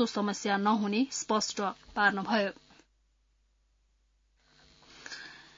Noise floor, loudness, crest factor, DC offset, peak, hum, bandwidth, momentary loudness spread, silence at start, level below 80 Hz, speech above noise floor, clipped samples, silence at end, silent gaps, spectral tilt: -71 dBFS; -30 LUFS; 22 dB; under 0.1%; -10 dBFS; none; 7.4 kHz; 16 LU; 0 s; -68 dBFS; 41 dB; under 0.1%; 0.15 s; none; -3 dB/octave